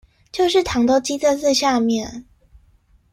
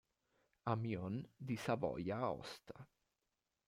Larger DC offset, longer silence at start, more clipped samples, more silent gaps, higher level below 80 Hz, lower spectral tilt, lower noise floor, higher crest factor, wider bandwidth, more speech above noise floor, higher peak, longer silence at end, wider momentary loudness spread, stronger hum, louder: neither; second, 0.35 s vs 0.65 s; neither; neither; first, -48 dBFS vs -74 dBFS; second, -3.5 dB/octave vs -7 dB/octave; second, -56 dBFS vs -89 dBFS; second, 14 dB vs 20 dB; about the same, 15.5 kHz vs 16 kHz; second, 38 dB vs 47 dB; first, -6 dBFS vs -24 dBFS; about the same, 0.9 s vs 0.8 s; about the same, 14 LU vs 13 LU; neither; first, -18 LUFS vs -43 LUFS